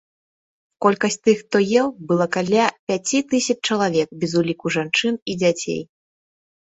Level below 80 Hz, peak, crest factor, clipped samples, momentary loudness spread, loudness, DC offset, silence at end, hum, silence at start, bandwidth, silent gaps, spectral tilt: -62 dBFS; 0 dBFS; 20 dB; under 0.1%; 5 LU; -20 LUFS; under 0.1%; 0.8 s; none; 0.8 s; 8.4 kHz; 2.79-2.87 s, 5.22-5.26 s; -4.5 dB/octave